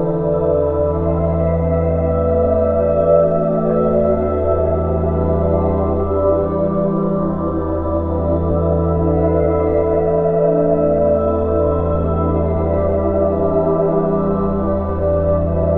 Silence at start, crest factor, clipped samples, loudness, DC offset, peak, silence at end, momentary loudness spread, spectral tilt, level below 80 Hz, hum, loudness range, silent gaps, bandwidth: 0 s; 14 dB; under 0.1%; -16 LUFS; 0.3%; -2 dBFS; 0 s; 3 LU; -13 dB/octave; -28 dBFS; none; 2 LU; none; 3.7 kHz